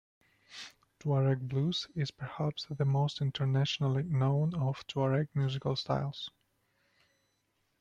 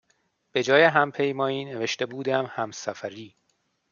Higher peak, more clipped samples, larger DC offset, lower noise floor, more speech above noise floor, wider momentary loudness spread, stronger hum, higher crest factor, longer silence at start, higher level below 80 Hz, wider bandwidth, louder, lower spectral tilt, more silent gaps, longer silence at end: second, -18 dBFS vs -4 dBFS; neither; neither; first, -77 dBFS vs -72 dBFS; about the same, 46 dB vs 48 dB; about the same, 13 LU vs 15 LU; neither; second, 16 dB vs 22 dB; about the same, 0.5 s vs 0.55 s; first, -66 dBFS vs -76 dBFS; about the same, 7.4 kHz vs 7.4 kHz; second, -32 LUFS vs -24 LUFS; first, -7 dB/octave vs -4.5 dB/octave; neither; first, 1.5 s vs 0.65 s